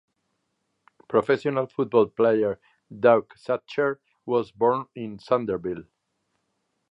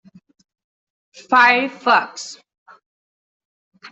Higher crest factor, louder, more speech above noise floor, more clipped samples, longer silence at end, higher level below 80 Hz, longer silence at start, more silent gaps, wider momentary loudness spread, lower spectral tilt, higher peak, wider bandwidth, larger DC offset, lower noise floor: about the same, 22 dB vs 20 dB; second, -24 LUFS vs -15 LUFS; second, 52 dB vs over 73 dB; neither; first, 1.1 s vs 0.05 s; first, -64 dBFS vs -70 dBFS; second, 1.1 s vs 1.3 s; second, none vs 2.58-2.66 s, 2.86-3.72 s; second, 14 LU vs 20 LU; first, -8 dB/octave vs -2 dB/octave; about the same, -4 dBFS vs -2 dBFS; about the same, 7.8 kHz vs 8.2 kHz; neither; second, -76 dBFS vs under -90 dBFS